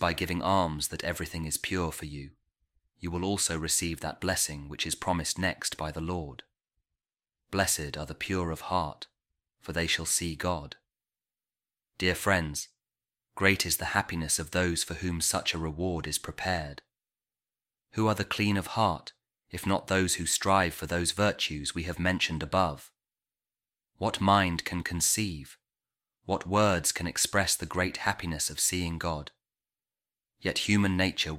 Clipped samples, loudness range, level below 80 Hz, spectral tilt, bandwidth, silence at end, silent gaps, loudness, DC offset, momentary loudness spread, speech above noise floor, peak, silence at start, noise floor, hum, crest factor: under 0.1%; 5 LU; -50 dBFS; -3.5 dB/octave; 16.5 kHz; 0 s; none; -29 LUFS; under 0.1%; 11 LU; over 60 dB; -6 dBFS; 0 s; under -90 dBFS; none; 24 dB